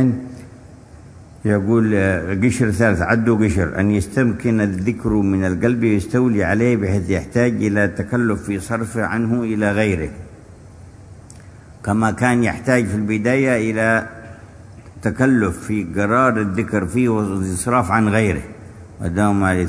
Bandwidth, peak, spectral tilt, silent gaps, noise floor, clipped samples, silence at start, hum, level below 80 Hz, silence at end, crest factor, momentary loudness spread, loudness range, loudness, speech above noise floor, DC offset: 11 kHz; 0 dBFS; -7 dB/octave; none; -41 dBFS; under 0.1%; 0 s; none; -42 dBFS; 0 s; 18 dB; 8 LU; 4 LU; -18 LUFS; 23 dB; under 0.1%